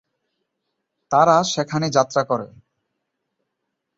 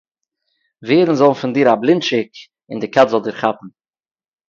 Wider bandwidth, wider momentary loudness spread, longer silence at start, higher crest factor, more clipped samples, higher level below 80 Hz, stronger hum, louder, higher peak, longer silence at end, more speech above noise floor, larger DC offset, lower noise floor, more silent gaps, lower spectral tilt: about the same, 8 kHz vs 7.4 kHz; second, 10 LU vs 17 LU; first, 1.1 s vs 0.8 s; about the same, 20 dB vs 18 dB; neither; about the same, -64 dBFS vs -60 dBFS; neither; second, -19 LUFS vs -15 LUFS; about the same, -2 dBFS vs 0 dBFS; first, 1.5 s vs 0.8 s; about the same, 60 dB vs 58 dB; neither; first, -78 dBFS vs -73 dBFS; neither; second, -4.5 dB/octave vs -6 dB/octave